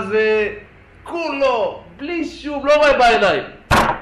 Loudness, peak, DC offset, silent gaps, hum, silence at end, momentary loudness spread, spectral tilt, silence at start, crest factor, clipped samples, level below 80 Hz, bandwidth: -17 LUFS; -6 dBFS; under 0.1%; none; none; 0 s; 13 LU; -4.5 dB/octave; 0 s; 12 dB; under 0.1%; -38 dBFS; 14 kHz